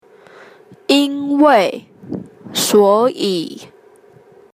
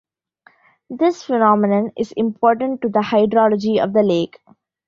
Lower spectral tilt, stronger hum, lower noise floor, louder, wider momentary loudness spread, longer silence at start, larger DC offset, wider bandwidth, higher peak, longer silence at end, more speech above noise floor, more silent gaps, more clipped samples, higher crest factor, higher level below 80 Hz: second, -3.5 dB/octave vs -7 dB/octave; neither; second, -46 dBFS vs -55 dBFS; first, -14 LUFS vs -17 LUFS; first, 19 LU vs 7 LU; about the same, 0.9 s vs 0.9 s; neither; first, 15.5 kHz vs 7.2 kHz; about the same, 0 dBFS vs -2 dBFS; first, 0.9 s vs 0.6 s; second, 33 dB vs 38 dB; neither; neither; about the same, 16 dB vs 16 dB; about the same, -62 dBFS vs -60 dBFS